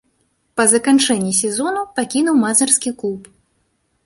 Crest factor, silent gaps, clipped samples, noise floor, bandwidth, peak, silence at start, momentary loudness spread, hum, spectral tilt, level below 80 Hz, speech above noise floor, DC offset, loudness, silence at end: 18 dB; none; under 0.1%; -65 dBFS; 11.5 kHz; 0 dBFS; 0.55 s; 12 LU; none; -2.5 dB/octave; -60 dBFS; 49 dB; under 0.1%; -16 LUFS; 0.85 s